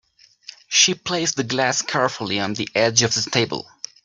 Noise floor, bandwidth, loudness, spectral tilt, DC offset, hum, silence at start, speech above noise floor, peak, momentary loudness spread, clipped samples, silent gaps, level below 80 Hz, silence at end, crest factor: -45 dBFS; 11 kHz; -19 LUFS; -2 dB/octave; under 0.1%; none; 0.5 s; 24 dB; 0 dBFS; 8 LU; under 0.1%; none; -60 dBFS; 0.4 s; 22 dB